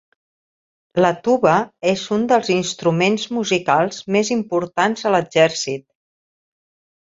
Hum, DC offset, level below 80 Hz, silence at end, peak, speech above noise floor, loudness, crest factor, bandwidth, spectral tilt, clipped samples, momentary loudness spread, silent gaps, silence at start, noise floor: none; under 0.1%; -60 dBFS; 1.25 s; -2 dBFS; over 72 dB; -18 LUFS; 18 dB; 8 kHz; -4.5 dB/octave; under 0.1%; 5 LU; none; 0.95 s; under -90 dBFS